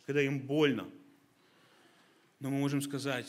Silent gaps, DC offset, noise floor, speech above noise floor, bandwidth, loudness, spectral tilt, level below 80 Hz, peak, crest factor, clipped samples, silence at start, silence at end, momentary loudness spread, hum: none; under 0.1%; -66 dBFS; 34 dB; 15.5 kHz; -33 LUFS; -5.5 dB/octave; -80 dBFS; -16 dBFS; 20 dB; under 0.1%; 0.1 s; 0 s; 11 LU; none